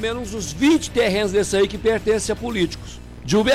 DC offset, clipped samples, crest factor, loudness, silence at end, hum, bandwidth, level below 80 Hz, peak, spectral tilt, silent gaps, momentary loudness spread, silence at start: under 0.1%; under 0.1%; 10 dB; -20 LUFS; 0 s; 60 Hz at -40 dBFS; 15.5 kHz; -38 dBFS; -10 dBFS; -4.5 dB/octave; none; 10 LU; 0 s